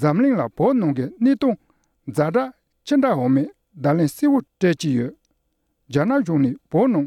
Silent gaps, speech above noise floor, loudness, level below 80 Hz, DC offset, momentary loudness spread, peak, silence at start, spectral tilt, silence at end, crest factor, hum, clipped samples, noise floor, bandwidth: none; 52 dB; -20 LUFS; -60 dBFS; under 0.1%; 10 LU; -6 dBFS; 0 s; -7.5 dB/octave; 0 s; 14 dB; none; under 0.1%; -71 dBFS; 13 kHz